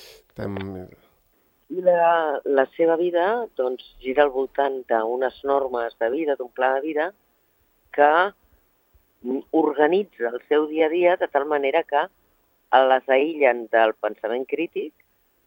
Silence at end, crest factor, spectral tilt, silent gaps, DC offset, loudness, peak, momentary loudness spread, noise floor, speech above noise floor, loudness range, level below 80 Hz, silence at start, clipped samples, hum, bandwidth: 0.55 s; 20 dB; -7 dB/octave; none; under 0.1%; -22 LUFS; -2 dBFS; 13 LU; -65 dBFS; 43 dB; 3 LU; -64 dBFS; 0 s; under 0.1%; none; 16.5 kHz